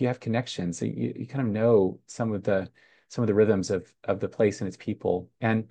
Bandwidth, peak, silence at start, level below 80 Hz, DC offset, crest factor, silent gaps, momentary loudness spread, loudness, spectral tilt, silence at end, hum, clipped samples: 9.6 kHz; -10 dBFS; 0 s; -66 dBFS; under 0.1%; 18 dB; none; 10 LU; -27 LUFS; -7 dB/octave; 0.05 s; none; under 0.1%